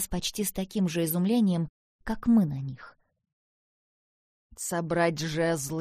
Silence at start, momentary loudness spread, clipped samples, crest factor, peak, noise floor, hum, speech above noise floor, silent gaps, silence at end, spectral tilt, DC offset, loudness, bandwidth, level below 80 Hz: 0 s; 12 LU; under 0.1%; 16 dB; -14 dBFS; under -90 dBFS; none; over 63 dB; 1.69-1.99 s, 3.33-4.50 s; 0 s; -5 dB/octave; under 0.1%; -28 LUFS; 15.5 kHz; -50 dBFS